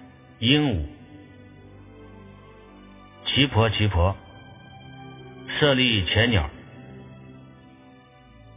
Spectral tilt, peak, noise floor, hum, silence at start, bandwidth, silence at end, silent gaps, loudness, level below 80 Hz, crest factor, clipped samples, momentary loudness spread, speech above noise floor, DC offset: -9.5 dB/octave; -2 dBFS; -50 dBFS; none; 0 s; 3.9 kHz; 1.2 s; none; -22 LUFS; -38 dBFS; 24 dB; under 0.1%; 25 LU; 30 dB; under 0.1%